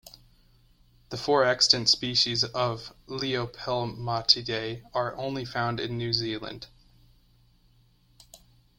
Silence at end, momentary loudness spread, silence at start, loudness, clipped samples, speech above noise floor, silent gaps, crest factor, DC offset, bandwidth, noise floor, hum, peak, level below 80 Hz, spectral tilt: 0.45 s; 16 LU; 0.05 s; -26 LUFS; under 0.1%; 34 dB; none; 26 dB; under 0.1%; 16.5 kHz; -62 dBFS; none; -4 dBFS; -58 dBFS; -3.5 dB/octave